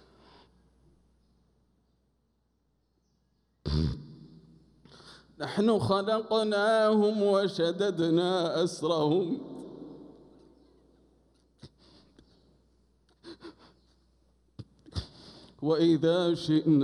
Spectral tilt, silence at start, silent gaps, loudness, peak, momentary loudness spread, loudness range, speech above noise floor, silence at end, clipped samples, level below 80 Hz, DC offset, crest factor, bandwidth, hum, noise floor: -6.5 dB/octave; 3.65 s; none; -28 LUFS; -14 dBFS; 24 LU; 17 LU; 48 dB; 0 s; under 0.1%; -52 dBFS; under 0.1%; 18 dB; 11 kHz; none; -74 dBFS